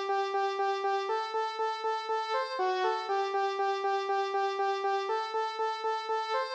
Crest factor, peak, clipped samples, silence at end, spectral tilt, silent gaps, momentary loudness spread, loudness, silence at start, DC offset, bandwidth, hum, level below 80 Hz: 12 dB; -18 dBFS; under 0.1%; 0 s; -0.5 dB/octave; none; 2 LU; -31 LUFS; 0 s; under 0.1%; 8.4 kHz; none; under -90 dBFS